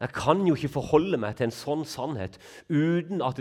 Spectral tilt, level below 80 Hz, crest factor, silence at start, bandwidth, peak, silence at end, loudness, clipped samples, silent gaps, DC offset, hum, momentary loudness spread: -6.5 dB/octave; -56 dBFS; 22 dB; 0 s; 15.5 kHz; -6 dBFS; 0 s; -27 LUFS; under 0.1%; none; under 0.1%; none; 9 LU